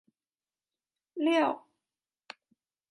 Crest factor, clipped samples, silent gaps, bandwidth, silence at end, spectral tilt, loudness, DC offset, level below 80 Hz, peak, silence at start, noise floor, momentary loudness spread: 20 dB; under 0.1%; none; 11 kHz; 1.3 s; -4 dB/octave; -29 LUFS; under 0.1%; under -90 dBFS; -14 dBFS; 1.15 s; under -90 dBFS; 24 LU